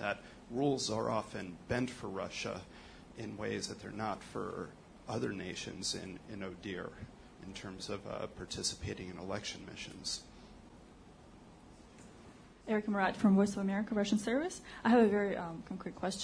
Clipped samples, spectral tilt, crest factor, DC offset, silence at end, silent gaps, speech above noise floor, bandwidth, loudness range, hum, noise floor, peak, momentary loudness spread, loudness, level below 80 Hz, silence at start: under 0.1%; -5 dB/octave; 20 dB; under 0.1%; 0 s; none; 21 dB; 10.5 kHz; 11 LU; none; -57 dBFS; -18 dBFS; 23 LU; -37 LUFS; -62 dBFS; 0 s